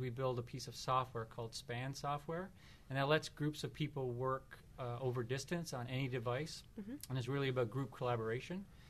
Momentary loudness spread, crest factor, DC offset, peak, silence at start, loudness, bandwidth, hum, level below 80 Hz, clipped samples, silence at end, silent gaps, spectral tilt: 10 LU; 22 dB; under 0.1%; -20 dBFS; 0 s; -42 LUFS; 13.5 kHz; none; -66 dBFS; under 0.1%; 0 s; none; -5.5 dB/octave